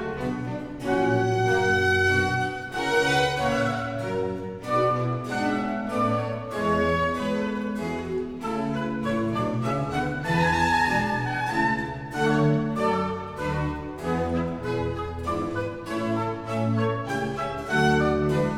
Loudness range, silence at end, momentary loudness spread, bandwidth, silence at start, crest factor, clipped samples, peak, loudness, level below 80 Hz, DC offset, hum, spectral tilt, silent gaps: 5 LU; 0 s; 9 LU; 16 kHz; 0 s; 14 dB; under 0.1%; -10 dBFS; -25 LUFS; -46 dBFS; under 0.1%; none; -6 dB/octave; none